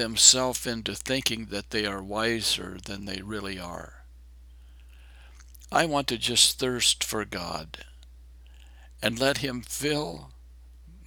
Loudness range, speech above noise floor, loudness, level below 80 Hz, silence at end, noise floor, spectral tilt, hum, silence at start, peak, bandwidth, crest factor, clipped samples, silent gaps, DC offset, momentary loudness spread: 7 LU; 22 dB; -25 LUFS; -50 dBFS; 0 s; -49 dBFS; -1.5 dB/octave; none; 0 s; -2 dBFS; over 20 kHz; 28 dB; under 0.1%; none; under 0.1%; 17 LU